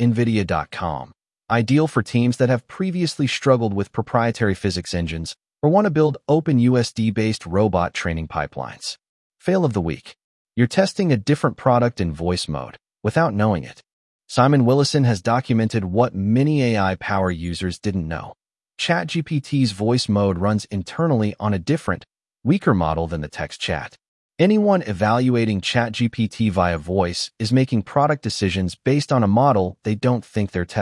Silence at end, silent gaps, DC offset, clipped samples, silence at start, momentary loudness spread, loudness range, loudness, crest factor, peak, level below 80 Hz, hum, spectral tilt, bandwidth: 0 s; 9.09-9.30 s, 10.24-10.45 s, 13.93-14.19 s, 24.08-24.29 s; under 0.1%; under 0.1%; 0 s; 10 LU; 3 LU; -20 LUFS; 18 dB; -2 dBFS; -48 dBFS; none; -6.5 dB/octave; 12 kHz